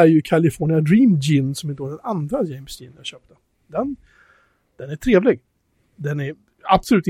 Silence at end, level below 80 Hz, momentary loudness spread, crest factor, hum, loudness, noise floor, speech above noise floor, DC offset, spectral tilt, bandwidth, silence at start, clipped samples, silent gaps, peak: 0 s; -46 dBFS; 19 LU; 18 dB; none; -20 LUFS; -64 dBFS; 46 dB; under 0.1%; -7 dB/octave; 16 kHz; 0 s; under 0.1%; none; -2 dBFS